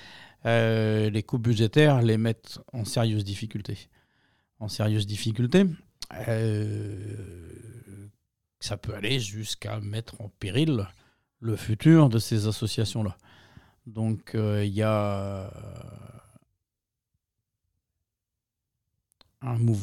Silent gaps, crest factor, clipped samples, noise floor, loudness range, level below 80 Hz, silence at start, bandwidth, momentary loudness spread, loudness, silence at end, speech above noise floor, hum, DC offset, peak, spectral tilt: none; 20 dB; under 0.1%; -87 dBFS; 9 LU; -58 dBFS; 0 s; 15 kHz; 20 LU; -26 LUFS; 0 s; 61 dB; none; under 0.1%; -6 dBFS; -6.5 dB/octave